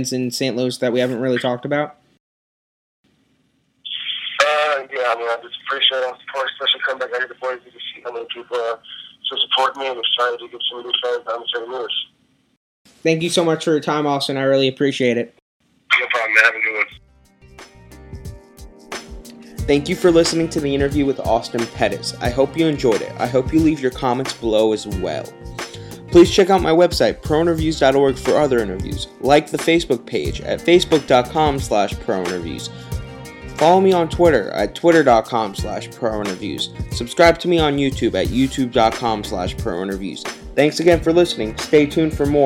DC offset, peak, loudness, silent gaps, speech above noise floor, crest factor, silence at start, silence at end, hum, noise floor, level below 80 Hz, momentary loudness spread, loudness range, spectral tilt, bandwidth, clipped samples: under 0.1%; 0 dBFS; -18 LUFS; 2.20-3.04 s, 12.57-12.85 s, 15.42-15.60 s; 45 dB; 18 dB; 0 s; 0 s; none; -63 dBFS; -38 dBFS; 14 LU; 6 LU; -4.5 dB/octave; 16 kHz; under 0.1%